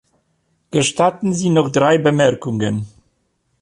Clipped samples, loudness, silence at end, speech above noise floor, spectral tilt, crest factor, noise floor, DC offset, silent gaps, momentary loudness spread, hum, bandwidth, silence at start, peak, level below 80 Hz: under 0.1%; -17 LUFS; 0.75 s; 51 dB; -5 dB/octave; 16 dB; -66 dBFS; under 0.1%; none; 8 LU; none; 11.5 kHz; 0.75 s; -2 dBFS; -54 dBFS